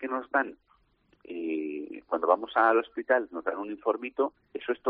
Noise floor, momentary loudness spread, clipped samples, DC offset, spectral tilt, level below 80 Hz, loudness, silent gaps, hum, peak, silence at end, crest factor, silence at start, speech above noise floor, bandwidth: -67 dBFS; 13 LU; under 0.1%; under 0.1%; -1.5 dB/octave; -74 dBFS; -29 LUFS; none; none; -8 dBFS; 0 s; 22 dB; 0 s; 39 dB; 4.8 kHz